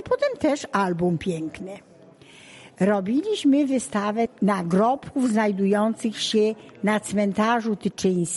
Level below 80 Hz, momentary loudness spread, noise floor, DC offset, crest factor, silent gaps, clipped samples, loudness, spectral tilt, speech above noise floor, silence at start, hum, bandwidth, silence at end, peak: -60 dBFS; 6 LU; -49 dBFS; under 0.1%; 14 dB; none; under 0.1%; -23 LUFS; -5.5 dB/octave; 27 dB; 0 s; none; 11.5 kHz; 0 s; -10 dBFS